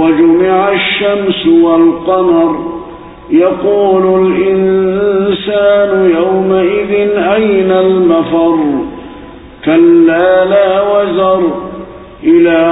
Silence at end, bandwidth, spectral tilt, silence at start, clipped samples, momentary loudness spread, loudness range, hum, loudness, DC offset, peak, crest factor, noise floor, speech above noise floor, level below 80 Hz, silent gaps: 0 s; 4 kHz; -11.5 dB/octave; 0 s; under 0.1%; 10 LU; 1 LU; none; -9 LUFS; under 0.1%; 0 dBFS; 10 dB; -31 dBFS; 22 dB; -42 dBFS; none